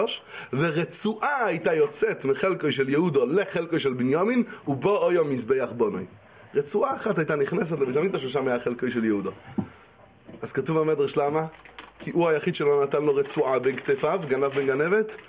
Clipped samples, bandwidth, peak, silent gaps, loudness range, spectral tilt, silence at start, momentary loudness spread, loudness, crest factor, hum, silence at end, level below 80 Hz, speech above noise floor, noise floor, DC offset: under 0.1%; 4 kHz; -12 dBFS; none; 4 LU; -10.5 dB/octave; 0 s; 9 LU; -25 LUFS; 14 dB; none; 0.05 s; -64 dBFS; 28 dB; -53 dBFS; under 0.1%